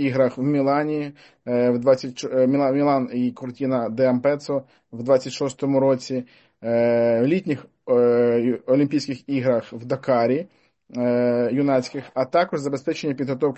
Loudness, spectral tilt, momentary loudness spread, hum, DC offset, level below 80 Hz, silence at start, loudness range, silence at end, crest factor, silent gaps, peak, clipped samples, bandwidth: -22 LUFS; -7 dB/octave; 10 LU; none; under 0.1%; -68 dBFS; 0 s; 2 LU; 0 s; 16 dB; none; -6 dBFS; under 0.1%; 8.4 kHz